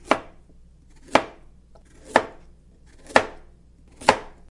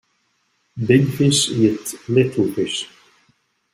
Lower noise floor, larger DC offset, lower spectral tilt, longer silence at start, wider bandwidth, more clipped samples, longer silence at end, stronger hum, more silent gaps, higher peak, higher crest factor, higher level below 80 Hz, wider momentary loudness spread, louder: second, -51 dBFS vs -66 dBFS; neither; second, -3.5 dB/octave vs -5 dB/octave; second, 0.1 s vs 0.75 s; second, 11.5 kHz vs 16 kHz; neither; second, 0.25 s vs 0.9 s; neither; neither; about the same, 0 dBFS vs -2 dBFS; first, 26 dB vs 18 dB; first, -50 dBFS vs -56 dBFS; about the same, 14 LU vs 12 LU; second, -23 LUFS vs -18 LUFS